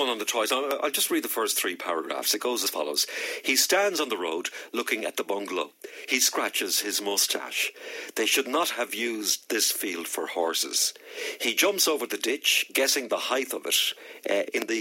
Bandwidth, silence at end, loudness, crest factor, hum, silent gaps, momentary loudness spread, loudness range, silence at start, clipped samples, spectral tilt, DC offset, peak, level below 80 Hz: 17 kHz; 0 s; -26 LUFS; 18 dB; none; none; 8 LU; 2 LU; 0 s; under 0.1%; 0.5 dB/octave; under 0.1%; -8 dBFS; under -90 dBFS